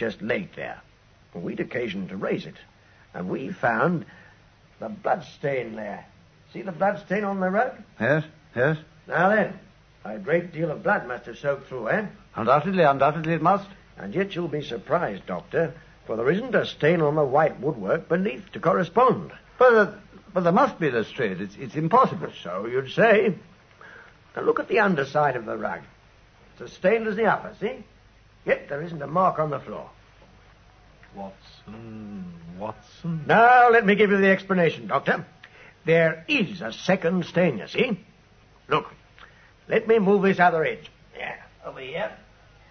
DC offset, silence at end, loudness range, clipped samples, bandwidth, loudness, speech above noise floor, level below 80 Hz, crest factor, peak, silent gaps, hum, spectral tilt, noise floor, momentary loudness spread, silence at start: under 0.1%; 0.55 s; 9 LU; under 0.1%; 6.6 kHz; -23 LUFS; 31 dB; -60 dBFS; 20 dB; -4 dBFS; none; none; -7 dB/octave; -55 dBFS; 19 LU; 0 s